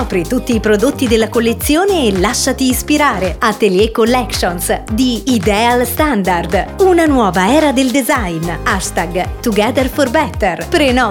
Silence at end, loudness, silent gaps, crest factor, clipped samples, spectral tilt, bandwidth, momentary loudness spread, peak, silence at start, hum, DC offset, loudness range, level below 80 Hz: 0 s; -13 LUFS; none; 12 dB; under 0.1%; -4.5 dB/octave; 18.5 kHz; 5 LU; 0 dBFS; 0 s; none; under 0.1%; 2 LU; -28 dBFS